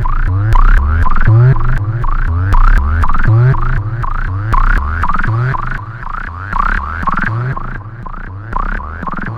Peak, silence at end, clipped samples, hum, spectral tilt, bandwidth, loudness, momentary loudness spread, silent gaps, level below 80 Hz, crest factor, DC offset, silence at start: 0 dBFS; 0 s; under 0.1%; none; -8.5 dB/octave; 4.9 kHz; -15 LUFS; 13 LU; none; -14 dBFS; 10 dB; under 0.1%; 0 s